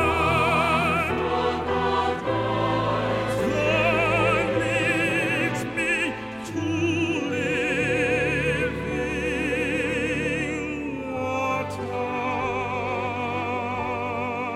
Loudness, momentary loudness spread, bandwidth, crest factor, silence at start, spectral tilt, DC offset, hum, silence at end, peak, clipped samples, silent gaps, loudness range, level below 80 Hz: -24 LUFS; 7 LU; 15.5 kHz; 14 dB; 0 s; -5.5 dB/octave; under 0.1%; none; 0 s; -10 dBFS; under 0.1%; none; 5 LU; -44 dBFS